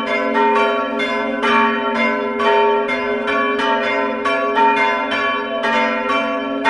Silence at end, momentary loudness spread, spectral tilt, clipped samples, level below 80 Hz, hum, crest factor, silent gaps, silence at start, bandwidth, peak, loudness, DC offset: 0 s; 4 LU; -4 dB/octave; under 0.1%; -54 dBFS; none; 16 dB; none; 0 s; 11 kHz; -2 dBFS; -17 LUFS; under 0.1%